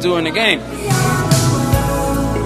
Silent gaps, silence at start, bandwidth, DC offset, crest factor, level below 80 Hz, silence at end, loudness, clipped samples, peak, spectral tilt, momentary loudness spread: none; 0 s; 15.5 kHz; 0.2%; 16 dB; -28 dBFS; 0 s; -15 LUFS; under 0.1%; 0 dBFS; -4.5 dB/octave; 4 LU